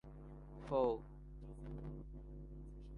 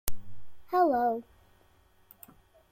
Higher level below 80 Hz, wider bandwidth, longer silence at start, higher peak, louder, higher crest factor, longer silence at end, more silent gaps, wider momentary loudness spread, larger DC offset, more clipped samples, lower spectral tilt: about the same, -54 dBFS vs -50 dBFS; second, 9.8 kHz vs 16.5 kHz; about the same, 0.05 s vs 0.05 s; second, -24 dBFS vs -4 dBFS; second, -44 LUFS vs -29 LUFS; about the same, 22 dB vs 26 dB; second, 0 s vs 1.5 s; neither; second, 19 LU vs 27 LU; neither; neither; first, -9 dB/octave vs -5 dB/octave